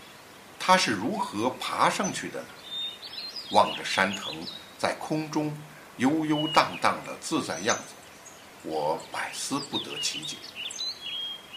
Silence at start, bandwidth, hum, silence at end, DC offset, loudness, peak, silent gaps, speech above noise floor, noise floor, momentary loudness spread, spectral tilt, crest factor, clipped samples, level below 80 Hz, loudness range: 0 s; 15.5 kHz; none; 0 s; under 0.1%; -28 LUFS; -6 dBFS; none; 21 dB; -49 dBFS; 16 LU; -3 dB/octave; 24 dB; under 0.1%; -68 dBFS; 4 LU